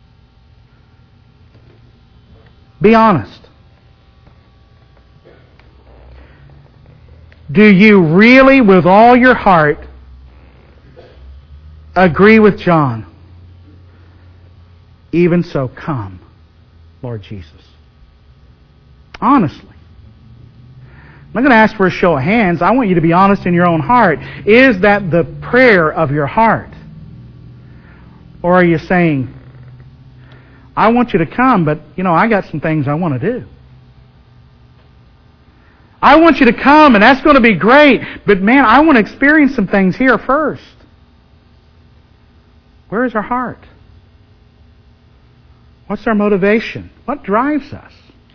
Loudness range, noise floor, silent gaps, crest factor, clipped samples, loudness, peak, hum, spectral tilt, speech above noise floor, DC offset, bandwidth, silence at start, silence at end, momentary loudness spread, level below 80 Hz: 14 LU; -46 dBFS; none; 14 dB; 0.4%; -10 LUFS; 0 dBFS; none; -8 dB/octave; 36 dB; under 0.1%; 5.4 kHz; 2.8 s; 0.6 s; 17 LU; -38 dBFS